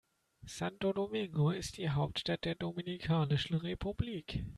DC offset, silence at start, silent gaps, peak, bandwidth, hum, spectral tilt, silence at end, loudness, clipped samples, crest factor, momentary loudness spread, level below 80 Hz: under 0.1%; 0.45 s; none; -20 dBFS; 12.5 kHz; none; -6 dB/octave; 0 s; -36 LUFS; under 0.1%; 16 dB; 7 LU; -54 dBFS